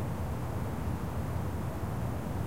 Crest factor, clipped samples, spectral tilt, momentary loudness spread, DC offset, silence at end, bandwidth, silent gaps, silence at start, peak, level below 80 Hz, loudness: 12 dB; under 0.1%; -7.5 dB/octave; 1 LU; 0.7%; 0 s; 16 kHz; none; 0 s; -22 dBFS; -42 dBFS; -36 LUFS